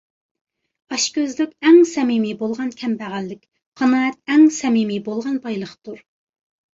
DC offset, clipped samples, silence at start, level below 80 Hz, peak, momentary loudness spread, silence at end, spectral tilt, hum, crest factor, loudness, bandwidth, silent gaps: under 0.1%; under 0.1%; 0.9 s; -66 dBFS; -2 dBFS; 16 LU; 0.8 s; -4 dB/octave; none; 18 dB; -18 LUFS; 8 kHz; 3.66-3.72 s